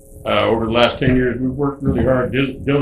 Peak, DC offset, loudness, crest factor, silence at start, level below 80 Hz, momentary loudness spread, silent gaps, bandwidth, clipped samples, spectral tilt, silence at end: 0 dBFS; under 0.1%; -17 LUFS; 16 dB; 0.1 s; -32 dBFS; 5 LU; none; 12.5 kHz; under 0.1%; -7.5 dB/octave; 0 s